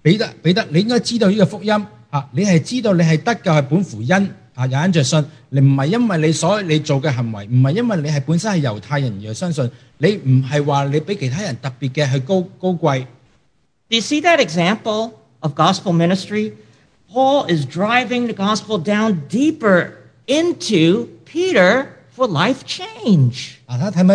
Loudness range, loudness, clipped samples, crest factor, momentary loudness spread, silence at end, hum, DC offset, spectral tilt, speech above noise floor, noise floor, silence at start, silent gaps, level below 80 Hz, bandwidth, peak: 2 LU; -17 LUFS; under 0.1%; 16 dB; 9 LU; 0 s; none; under 0.1%; -6 dB/octave; 47 dB; -63 dBFS; 0.05 s; none; -60 dBFS; 10.5 kHz; 0 dBFS